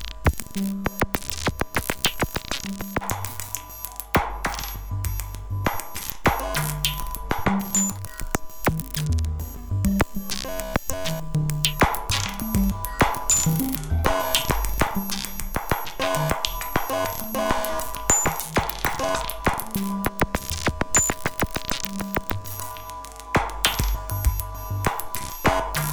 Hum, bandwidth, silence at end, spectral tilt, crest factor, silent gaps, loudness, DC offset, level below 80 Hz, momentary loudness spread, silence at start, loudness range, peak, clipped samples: none; over 20 kHz; 0 s; -3.5 dB/octave; 24 dB; none; -25 LUFS; under 0.1%; -34 dBFS; 9 LU; 0 s; 4 LU; -2 dBFS; under 0.1%